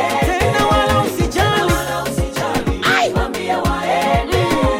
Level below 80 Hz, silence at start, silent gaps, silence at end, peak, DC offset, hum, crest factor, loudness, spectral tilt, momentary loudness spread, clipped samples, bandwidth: -28 dBFS; 0 s; none; 0 s; -2 dBFS; under 0.1%; none; 14 dB; -17 LUFS; -5 dB/octave; 6 LU; under 0.1%; 16.5 kHz